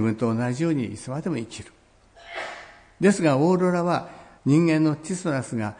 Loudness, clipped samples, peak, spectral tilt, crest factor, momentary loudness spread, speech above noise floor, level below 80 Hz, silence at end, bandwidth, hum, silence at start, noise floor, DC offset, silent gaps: -23 LUFS; under 0.1%; -8 dBFS; -6.5 dB/octave; 16 dB; 17 LU; 30 dB; -60 dBFS; 0.05 s; 10.5 kHz; none; 0 s; -53 dBFS; under 0.1%; none